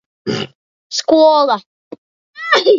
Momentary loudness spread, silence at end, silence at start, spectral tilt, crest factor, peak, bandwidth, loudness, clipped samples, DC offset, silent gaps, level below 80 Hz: 14 LU; 0 s; 0.25 s; -3.5 dB/octave; 16 dB; 0 dBFS; 7.6 kHz; -14 LUFS; under 0.1%; under 0.1%; 0.55-0.90 s, 1.66-1.91 s, 1.98-2.34 s; -60 dBFS